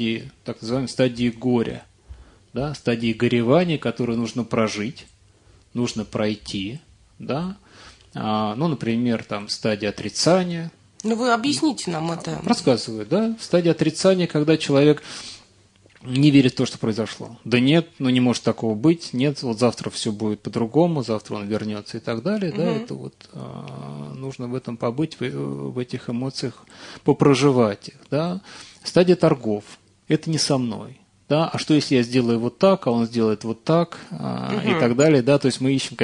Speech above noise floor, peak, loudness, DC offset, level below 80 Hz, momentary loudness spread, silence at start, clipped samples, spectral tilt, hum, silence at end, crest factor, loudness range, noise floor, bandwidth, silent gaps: 33 dB; -2 dBFS; -22 LUFS; under 0.1%; -56 dBFS; 15 LU; 0 s; under 0.1%; -6 dB/octave; none; 0 s; 20 dB; 8 LU; -55 dBFS; 11 kHz; none